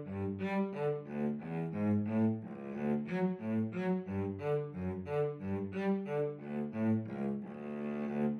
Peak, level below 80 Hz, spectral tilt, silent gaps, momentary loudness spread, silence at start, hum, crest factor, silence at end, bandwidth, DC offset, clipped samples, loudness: -24 dBFS; -72 dBFS; -10 dB/octave; none; 6 LU; 0 s; none; 12 dB; 0 s; 6.2 kHz; under 0.1%; under 0.1%; -36 LUFS